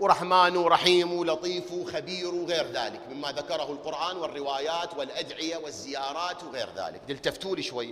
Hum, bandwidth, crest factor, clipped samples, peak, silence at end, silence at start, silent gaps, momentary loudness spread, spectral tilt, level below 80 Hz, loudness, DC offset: none; 14.5 kHz; 22 dB; under 0.1%; -6 dBFS; 0 s; 0 s; none; 14 LU; -3.5 dB/octave; -64 dBFS; -28 LUFS; under 0.1%